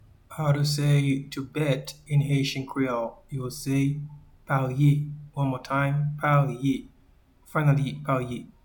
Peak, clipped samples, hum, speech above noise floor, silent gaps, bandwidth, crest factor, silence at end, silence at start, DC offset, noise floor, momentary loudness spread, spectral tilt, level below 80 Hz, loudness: -8 dBFS; under 0.1%; none; 33 dB; none; 19 kHz; 18 dB; 0.2 s; 0.3 s; under 0.1%; -58 dBFS; 11 LU; -6.5 dB/octave; -54 dBFS; -26 LUFS